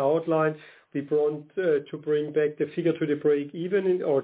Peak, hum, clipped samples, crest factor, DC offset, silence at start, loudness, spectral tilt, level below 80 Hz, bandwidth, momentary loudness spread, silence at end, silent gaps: -12 dBFS; none; under 0.1%; 14 dB; under 0.1%; 0 s; -26 LUFS; -11 dB/octave; -76 dBFS; 4 kHz; 4 LU; 0 s; none